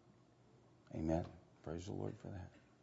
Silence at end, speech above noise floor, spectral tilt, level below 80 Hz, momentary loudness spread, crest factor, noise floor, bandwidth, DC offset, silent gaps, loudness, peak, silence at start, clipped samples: 0.15 s; 25 dB; -8 dB/octave; -62 dBFS; 14 LU; 22 dB; -68 dBFS; 7.6 kHz; under 0.1%; none; -46 LUFS; -24 dBFS; 0.05 s; under 0.1%